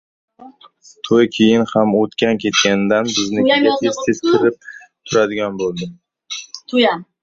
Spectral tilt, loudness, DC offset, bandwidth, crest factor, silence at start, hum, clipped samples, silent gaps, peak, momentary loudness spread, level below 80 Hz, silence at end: -4 dB/octave; -16 LUFS; under 0.1%; 7.6 kHz; 16 dB; 0.4 s; none; under 0.1%; none; 0 dBFS; 15 LU; -56 dBFS; 0.2 s